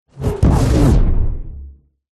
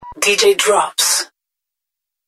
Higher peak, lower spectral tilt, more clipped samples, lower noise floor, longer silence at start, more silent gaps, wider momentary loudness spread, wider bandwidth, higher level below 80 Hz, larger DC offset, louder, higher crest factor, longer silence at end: about the same, -2 dBFS vs 0 dBFS; first, -7.5 dB/octave vs 0.5 dB/octave; neither; second, -38 dBFS vs -83 dBFS; first, 0.15 s vs 0 s; neither; first, 19 LU vs 6 LU; second, 13 kHz vs 15.5 kHz; first, -18 dBFS vs -58 dBFS; neither; second, -16 LUFS vs -13 LUFS; about the same, 12 dB vs 16 dB; second, 0.45 s vs 1 s